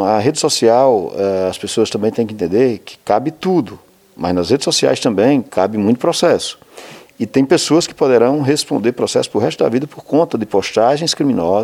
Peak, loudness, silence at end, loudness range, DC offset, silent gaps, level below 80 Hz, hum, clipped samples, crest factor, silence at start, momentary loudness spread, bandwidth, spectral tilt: 0 dBFS; -15 LUFS; 0 s; 2 LU; under 0.1%; none; -54 dBFS; none; under 0.1%; 14 dB; 0 s; 6 LU; 15.5 kHz; -4.5 dB/octave